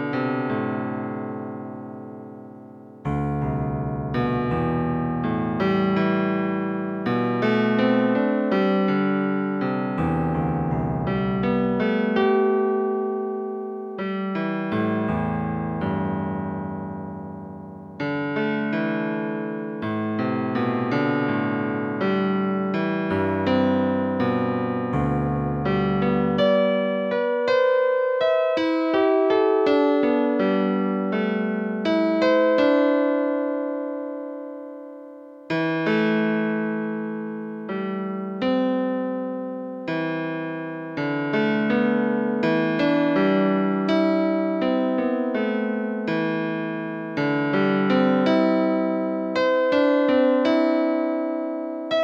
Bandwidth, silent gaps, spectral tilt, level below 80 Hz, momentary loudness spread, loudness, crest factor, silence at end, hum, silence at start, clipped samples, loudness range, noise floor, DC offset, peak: 7 kHz; none; -8.5 dB/octave; -50 dBFS; 11 LU; -23 LUFS; 14 dB; 0 s; none; 0 s; under 0.1%; 6 LU; -43 dBFS; under 0.1%; -8 dBFS